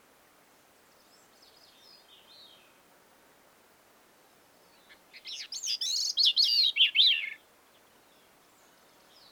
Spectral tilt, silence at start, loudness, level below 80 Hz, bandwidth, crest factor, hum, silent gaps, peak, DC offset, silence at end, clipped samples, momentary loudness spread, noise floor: 3.5 dB/octave; 5.15 s; -24 LUFS; -86 dBFS; over 20 kHz; 22 dB; none; none; -12 dBFS; under 0.1%; 1.95 s; under 0.1%; 20 LU; -62 dBFS